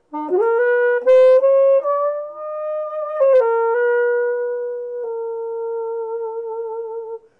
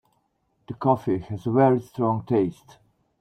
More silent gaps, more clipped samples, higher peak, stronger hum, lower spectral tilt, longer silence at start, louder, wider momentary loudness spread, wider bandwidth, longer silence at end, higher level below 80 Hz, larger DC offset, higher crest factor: neither; neither; about the same, -6 dBFS vs -6 dBFS; neither; second, -4.5 dB/octave vs -9.5 dB/octave; second, 0.1 s vs 0.7 s; first, -18 LUFS vs -24 LUFS; first, 14 LU vs 8 LU; second, 4.4 kHz vs 13.5 kHz; second, 0.2 s vs 0.7 s; second, -72 dBFS vs -60 dBFS; neither; second, 12 dB vs 18 dB